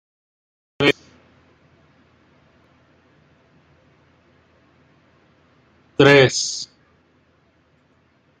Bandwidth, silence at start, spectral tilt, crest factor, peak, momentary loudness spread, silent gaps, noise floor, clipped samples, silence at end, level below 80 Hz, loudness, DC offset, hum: 9.6 kHz; 0.8 s; -4 dB/octave; 24 dB; 0 dBFS; 19 LU; none; -60 dBFS; under 0.1%; 1.75 s; -62 dBFS; -17 LUFS; under 0.1%; none